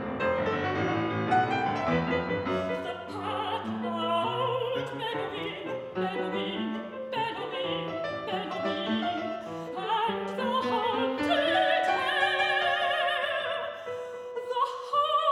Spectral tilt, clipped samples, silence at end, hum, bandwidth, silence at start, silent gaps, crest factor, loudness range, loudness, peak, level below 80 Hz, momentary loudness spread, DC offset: -5.5 dB/octave; under 0.1%; 0 s; none; 13.5 kHz; 0 s; none; 16 dB; 6 LU; -29 LUFS; -12 dBFS; -64 dBFS; 10 LU; under 0.1%